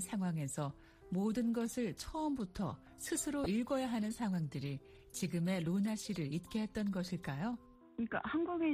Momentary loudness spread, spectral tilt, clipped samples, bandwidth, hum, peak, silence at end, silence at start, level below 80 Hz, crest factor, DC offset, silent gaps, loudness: 8 LU; -5.5 dB/octave; under 0.1%; 15.5 kHz; none; -24 dBFS; 0 s; 0 s; -62 dBFS; 14 dB; under 0.1%; none; -39 LUFS